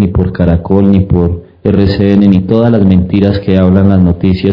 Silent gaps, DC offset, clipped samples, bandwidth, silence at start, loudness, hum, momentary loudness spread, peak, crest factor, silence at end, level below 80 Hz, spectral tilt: none; 0.4%; 4%; 5.4 kHz; 0 s; -9 LUFS; none; 4 LU; 0 dBFS; 8 dB; 0 s; -30 dBFS; -10.5 dB/octave